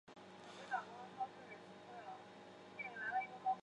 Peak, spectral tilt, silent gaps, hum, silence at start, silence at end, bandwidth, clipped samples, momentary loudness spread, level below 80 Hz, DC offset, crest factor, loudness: -30 dBFS; -4 dB/octave; none; none; 0.05 s; 0 s; 10.5 kHz; under 0.1%; 15 LU; -88 dBFS; under 0.1%; 18 dB; -48 LUFS